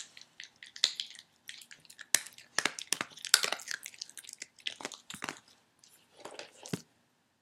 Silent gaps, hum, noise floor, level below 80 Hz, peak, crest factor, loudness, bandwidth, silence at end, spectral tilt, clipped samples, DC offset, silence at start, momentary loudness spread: none; none; -72 dBFS; -86 dBFS; -2 dBFS; 36 dB; -33 LUFS; 16.5 kHz; 0.6 s; 0 dB/octave; under 0.1%; under 0.1%; 0 s; 22 LU